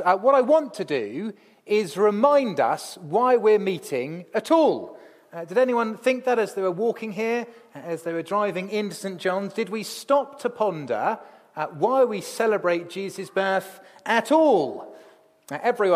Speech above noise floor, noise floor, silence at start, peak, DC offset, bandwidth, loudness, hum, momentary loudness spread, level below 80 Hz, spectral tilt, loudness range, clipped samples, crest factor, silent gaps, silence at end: 30 dB; -53 dBFS; 0 s; -6 dBFS; under 0.1%; 15.5 kHz; -23 LUFS; none; 14 LU; -80 dBFS; -5 dB/octave; 5 LU; under 0.1%; 18 dB; none; 0 s